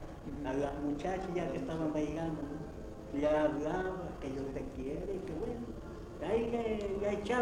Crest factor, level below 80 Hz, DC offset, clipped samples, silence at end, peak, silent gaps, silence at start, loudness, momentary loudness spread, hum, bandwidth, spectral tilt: 16 dB; -50 dBFS; under 0.1%; under 0.1%; 0 s; -20 dBFS; none; 0 s; -37 LUFS; 10 LU; none; 13.5 kHz; -7 dB/octave